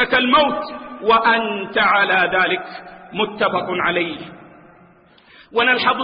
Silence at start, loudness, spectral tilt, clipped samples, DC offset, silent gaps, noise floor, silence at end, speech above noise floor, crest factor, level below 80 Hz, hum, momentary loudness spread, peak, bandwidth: 0 s; -17 LUFS; -9 dB/octave; under 0.1%; under 0.1%; none; -50 dBFS; 0 s; 32 dB; 16 dB; -54 dBFS; none; 16 LU; -4 dBFS; 5.2 kHz